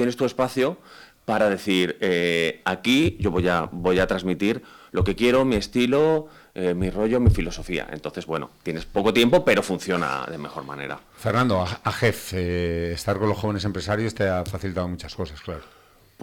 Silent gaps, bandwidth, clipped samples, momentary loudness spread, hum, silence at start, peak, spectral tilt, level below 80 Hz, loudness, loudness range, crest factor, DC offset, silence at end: none; 19 kHz; under 0.1%; 13 LU; none; 0 s; -6 dBFS; -6 dB/octave; -40 dBFS; -23 LUFS; 3 LU; 18 dB; under 0.1%; 0 s